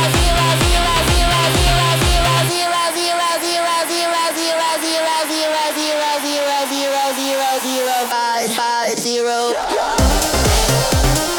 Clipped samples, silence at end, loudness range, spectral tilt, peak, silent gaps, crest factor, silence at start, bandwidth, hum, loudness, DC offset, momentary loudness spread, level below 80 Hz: under 0.1%; 0 s; 3 LU; -3.5 dB/octave; -2 dBFS; none; 14 dB; 0 s; 19 kHz; none; -16 LUFS; under 0.1%; 4 LU; -24 dBFS